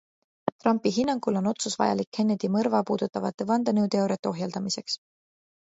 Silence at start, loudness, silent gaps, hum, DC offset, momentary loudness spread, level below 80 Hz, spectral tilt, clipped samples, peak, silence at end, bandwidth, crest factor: 0.45 s; -27 LUFS; 0.52-0.59 s, 2.07-2.12 s, 3.34-3.38 s, 4.19-4.23 s; none; under 0.1%; 6 LU; -70 dBFS; -5.5 dB/octave; under 0.1%; -8 dBFS; 0.7 s; 8 kHz; 20 dB